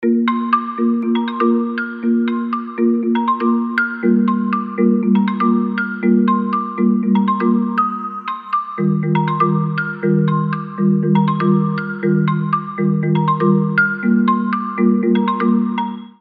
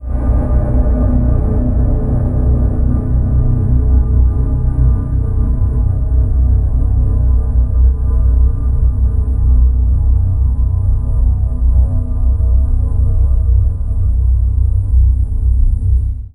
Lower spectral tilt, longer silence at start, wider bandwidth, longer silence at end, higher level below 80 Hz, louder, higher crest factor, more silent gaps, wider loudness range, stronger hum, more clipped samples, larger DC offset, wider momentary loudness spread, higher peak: second, -10.5 dB/octave vs -12 dB/octave; about the same, 0 s vs 0 s; first, 4.9 kHz vs 1.8 kHz; about the same, 0.15 s vs 0.05 s; second, -72 dBFS vs -12 dBFS; about the same, -17 LUFS vs -15 LUFS; about the same, 14 dB vs 10 dB; neither; about the same, 2 LU vs 1 LU; neither; neither; neither; about the same, 5 LU vs 3 LU; about the same, -2 dBFS vs -2 dBFS